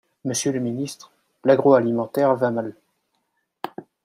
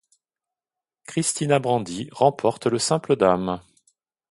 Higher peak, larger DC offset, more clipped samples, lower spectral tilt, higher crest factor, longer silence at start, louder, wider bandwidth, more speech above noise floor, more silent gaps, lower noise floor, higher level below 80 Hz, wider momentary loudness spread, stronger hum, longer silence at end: about the same, -2 dBFS vs -4 dBFS; neither; neither; about the same, -5.5 dB/octave vs -4.5 dB/octave; about the same, 20 dB vs 20 dB; second, 0.25 s vs 1.1 s; about the same, -21 LUFS vs -22 LUFS; first, 15.5 kHz vs 11.5 kHz; second, 53 dB vs 68 dB; neither; second, -73 dBFS vs -90 dBFS; second, -70 dBFS vs -58 dBFS; first, 19 LU vs 10 LU; neither; second, 0.25 s vs 0.7 s